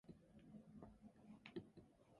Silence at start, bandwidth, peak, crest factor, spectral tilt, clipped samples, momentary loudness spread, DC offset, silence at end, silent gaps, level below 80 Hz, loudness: 0.05 s; 11 kHz; -40 dBFS; 22 dB; -7 dB/octave; under 0.1%; 9 LU; under 0.1%; 0 s; none; -78 dBFS; -62 LUFS